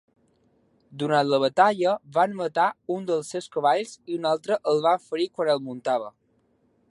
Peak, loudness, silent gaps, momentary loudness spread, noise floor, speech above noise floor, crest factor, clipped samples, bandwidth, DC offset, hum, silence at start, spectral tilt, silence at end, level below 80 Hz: -6 dBFS; -24 LUFS; none; 10 LU; -67 dBFS; 43 dB; 20 dB; under 0.1%; 11.5 kHz; under 0.1%; none; 0.9 s; -5 dB/octave; 0.8 s; -76 dBFS